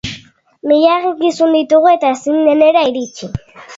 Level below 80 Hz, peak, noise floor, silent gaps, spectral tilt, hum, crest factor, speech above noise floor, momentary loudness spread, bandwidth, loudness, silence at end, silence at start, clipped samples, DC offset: -46 dBFS; 0 dBFS; -40 dBFS; none; -5.5 dB/octave; none; 12 dB; 28 dB; 16 LU; 7.8 kHz; -12 LUFS; 0 s; 0.05 s; under 0.1%; under 0.1%